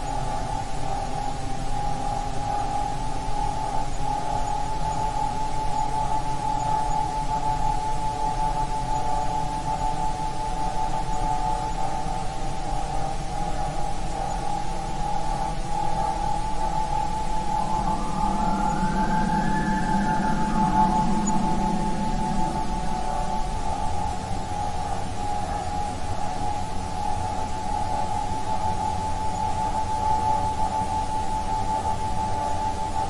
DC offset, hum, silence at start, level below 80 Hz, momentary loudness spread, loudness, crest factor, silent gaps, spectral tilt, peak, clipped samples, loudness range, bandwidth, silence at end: under 0.1%; none; 0 s; -32 dBFS; 6 LU; -27 LUFS; 16 dB; none; -5.5 dB/octave; -8 dBFS; under 0.1%; 5 LU; 11.5 kHz; 0 s